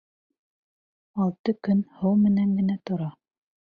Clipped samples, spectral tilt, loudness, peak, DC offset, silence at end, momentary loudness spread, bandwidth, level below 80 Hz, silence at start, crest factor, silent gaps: under 0.1%; -10.5 dB/octave; -25 LUFS; -12 dBFS; under 0.1%; 0.6 s; 10 LU; 5 kHz; -64 dBFS; 1.15 s; 14 dB; 1.39-1.44 s